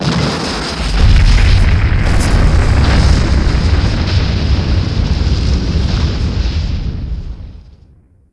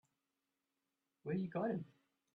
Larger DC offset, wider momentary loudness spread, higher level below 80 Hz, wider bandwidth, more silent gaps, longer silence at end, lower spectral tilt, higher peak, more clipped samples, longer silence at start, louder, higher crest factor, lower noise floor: neither; second, 10 LU vs 13 LU; first, -14 dBFS vs -82 dBFS; first, 11 kHz vs 4.5 kHz; neither; about the same, 0.6 s vs 0.5 s; second, -6 dB/octave vs -10 dB/octave; first, 0 dBFS vs -30 dBFS; neither; second, 0 s vs 1.25 s; first, -14 LUFS vs -42 LUFS; about the same, 12 dB vs 16 dB; second, -45 dBFS vs -89 dBFS